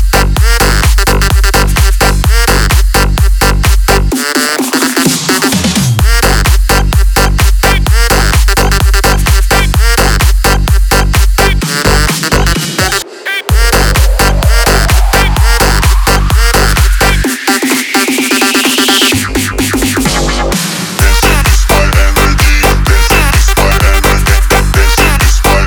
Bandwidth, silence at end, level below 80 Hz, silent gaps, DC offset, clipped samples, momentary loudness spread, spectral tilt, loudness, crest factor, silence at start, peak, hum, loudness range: over 20 kHz; 0 s; -10 dBFS; none; under 0.1%; 0.6%; 3 LU; -3.5 dB/octave; -9 LUFS; 8 dB; 0 s; 0 dBFS; none; 1 LU